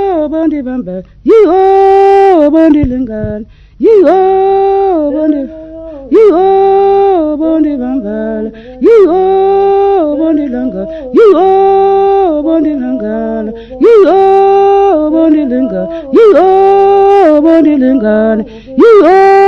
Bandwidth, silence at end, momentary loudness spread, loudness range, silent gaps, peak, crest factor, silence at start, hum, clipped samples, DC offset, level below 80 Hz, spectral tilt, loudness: 6.2 kHz; 0 s; 12 LU; 3 LU; none; 0 dBFS; 8 dB; 0 s; none; 5%; under 0.1%; -36 dBFS; -8 dB/octave; -7 LUFS